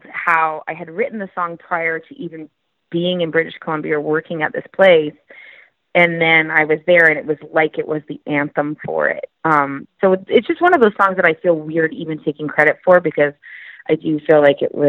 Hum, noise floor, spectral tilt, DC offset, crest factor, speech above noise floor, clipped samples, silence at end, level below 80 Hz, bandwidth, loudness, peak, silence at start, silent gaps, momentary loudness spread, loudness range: none; -46 dBFS; -7.5 dB/octave; under 0.1%; 16 dB; 30 dB; under 0.1%; 0 s; -64 dBFS; 6 kHz; -16 LUFS; 0 dBFS; 0.1 s; none; 12 LU; 7 LU